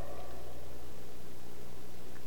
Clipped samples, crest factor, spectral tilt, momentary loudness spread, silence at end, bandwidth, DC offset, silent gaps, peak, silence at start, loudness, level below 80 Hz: under 0.1%; 16 dB; -5 dB/octave; 4 LU; 0 s; 19.5 kHz; 4%; none; -26 dBFS; 0 s; -50 LUFS; -58 dBFS